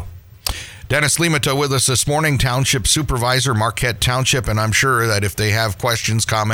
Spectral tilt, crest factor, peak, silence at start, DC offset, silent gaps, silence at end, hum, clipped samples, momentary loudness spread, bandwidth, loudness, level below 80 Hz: -3.5 dB/octave; 16 dB; 0 dBFS; 0 s; under 0.1%; none; 0 s; none; under 0.1%; 6 LU; over 20 kHz; -17 LUFS; -34 dBFS